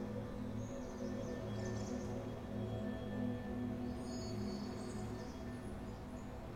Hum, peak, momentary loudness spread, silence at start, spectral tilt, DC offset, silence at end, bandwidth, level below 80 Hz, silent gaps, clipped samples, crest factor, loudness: none; -30 dBFS; 5 LU; 0 s; -6.5 dB/octave; under 0.1%; 0 s; 16.5 kHz; -54 dBFS; none; under 0.1%; 14 dB; -44 LUFS